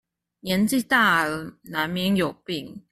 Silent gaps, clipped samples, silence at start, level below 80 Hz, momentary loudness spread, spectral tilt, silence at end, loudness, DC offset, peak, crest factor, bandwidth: none; under 0.1%; 0.45 s; -58 dBFS; 14 LU; -4.5 dB/octave; 0.15 s; -23 LUFS; under 0.1%; -6 dBFS; 18 dB; 15.5 kHz